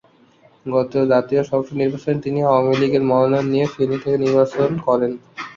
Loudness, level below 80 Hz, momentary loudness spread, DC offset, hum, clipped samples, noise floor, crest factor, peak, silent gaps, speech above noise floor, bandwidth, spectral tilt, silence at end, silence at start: -18 LUFS; -56 dBFS; 6 LU; under 0.1%; none; under 0.1%; -52 dBFS; 16 dB; -2 dBFS; none; 35 dB; 7.4 kHz; -8 dB/octave; 0.05 s; 0.65 s